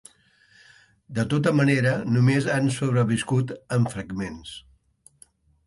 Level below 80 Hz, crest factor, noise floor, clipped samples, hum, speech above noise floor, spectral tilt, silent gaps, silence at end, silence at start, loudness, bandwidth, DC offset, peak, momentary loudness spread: -56 dBFS; 16 dB; -59 dBFS; under 0.1%; none; 36 dB; -6.5 dB/octave; none; 1.05 s; 1.1 s; -23 LUFS; 11.5 kHz; under 0.1%; -8 dBFS; 13 LU